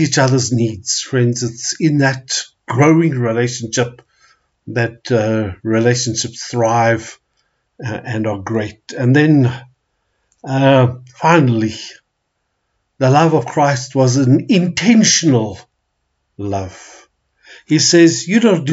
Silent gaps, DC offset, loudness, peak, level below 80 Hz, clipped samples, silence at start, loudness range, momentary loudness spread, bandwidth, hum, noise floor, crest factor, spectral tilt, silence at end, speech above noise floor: none; under 0.1%; -15 LUFS; 0 dBFS; -56 dBFS; under 0.1%; 0 s; 5 LU; 12 LU; 8 kHz; none; -70 dBFS; 14 dB; -5 dB/octave; 0 s; 56 dB